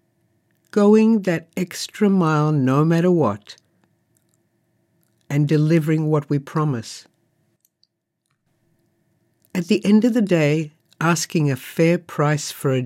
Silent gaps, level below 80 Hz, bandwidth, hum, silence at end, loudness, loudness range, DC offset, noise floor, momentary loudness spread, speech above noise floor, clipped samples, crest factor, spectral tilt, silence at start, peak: none; -72 dBFS; 16 kHz; none; 0 s; -19 LUFS; 8 LU; under 0.1%; -73 dBFS; 11 LU; 55 dB; under 0.1%; 16 dB; -6.5 dB/octave; 0.75 s; -4 dBFS